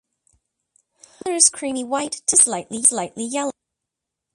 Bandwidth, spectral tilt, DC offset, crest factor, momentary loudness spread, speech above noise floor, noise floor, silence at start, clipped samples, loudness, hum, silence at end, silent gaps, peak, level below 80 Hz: 12 kHz; -1 dB/octave; under 0.1%; 24 dB; 13 LU; 63 dB; -83 dBFS; 1.25 s; under 0.1%; -18 LUFS; none; 0.85 s; none; 0 dBFS; -66 dBFS